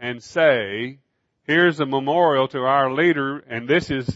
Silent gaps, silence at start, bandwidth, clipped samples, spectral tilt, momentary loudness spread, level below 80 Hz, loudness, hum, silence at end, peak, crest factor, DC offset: none; 0 s; 8 kHz; under 0.1%; -6 dB/octave; 11 LU; -56 dBFS; -20 LUFS; none; 0 s; -4 dBFS; 16 dB; under 0.1%